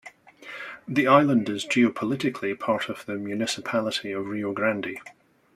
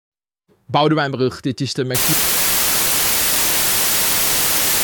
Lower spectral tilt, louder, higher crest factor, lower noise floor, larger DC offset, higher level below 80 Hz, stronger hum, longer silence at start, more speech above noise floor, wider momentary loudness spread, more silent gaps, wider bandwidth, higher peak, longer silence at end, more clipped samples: first, -5 dB/octave vs -2 dB/octave; second, -25 LUFS vs -15 LUFS; first, 22 dB vs 14 dB; second, -45 dBFS vs -62 dBFS; neither; second, -70 dBFS vs -44 dBFS; neither; second, 0.05 s vs 0.7 s; second, 21 dB vs 44 dB; first, 17 LU vs 7 LU; neither; second, 14.5 kHz vs 19.5 kHz; about the same, -4 dBFS vs -4 dBFS; first, 0.45 s vs 0 s; neither